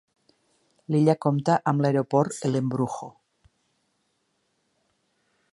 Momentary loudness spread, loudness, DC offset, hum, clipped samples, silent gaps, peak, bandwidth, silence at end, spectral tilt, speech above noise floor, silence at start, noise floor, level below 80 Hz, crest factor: 8 LU; -24 LUFS; under 0.1%; none; under 0.1%; none; -6 dBFS; 11.5 kHz; 2.4 s; -7.5 dB/octave; 50 dB; 0.9 s; -73 dBFS; -70 dBFS; 20 dB